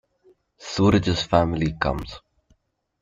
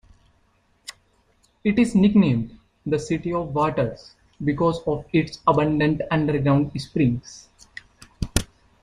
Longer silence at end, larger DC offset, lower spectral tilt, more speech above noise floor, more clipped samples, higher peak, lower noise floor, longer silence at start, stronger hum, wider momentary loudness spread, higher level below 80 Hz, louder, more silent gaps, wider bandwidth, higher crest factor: first, 0.85 s vs 0.35 s; neither; about the same, -6 dB/octave vs -6.5 dB/octave; about the same, 45 dB vs 42 dB; neither; about the same, -4 dBFS vs -2 dBFS; about the same, -66 dBFS vs -63 dBFS; second, 0.6 s vs 0.9 s; neither; about the same, 20 LU vs 22 LU; about the same, -42 dBFS vs -42 dBFS; about the same, -22 LUFS vs -22 LUFS; neither; second, 7.8 kHz vs 14.5 kHz; about the same, 20 dB vs 22 dB